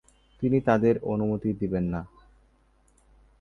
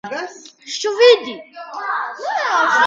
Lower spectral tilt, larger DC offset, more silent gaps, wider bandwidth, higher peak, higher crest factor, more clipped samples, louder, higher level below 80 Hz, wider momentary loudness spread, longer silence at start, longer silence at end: first, -9.5 dB/octave vs -1 dB/octave; neither; neither; first, 10.5 kHz vs 7.8 kHz; second, -8 dBFS vs 0 dBFS; about the same, 20 dB vs 18 dB; neither; second, -26 LUFS vs -17 LUFS; first, -50 dBFS vs -74 dBFS; second, 10 LU vs 20 LU; first, 0.4 s vs 0.05 s; first, 1.35 s vs 0 s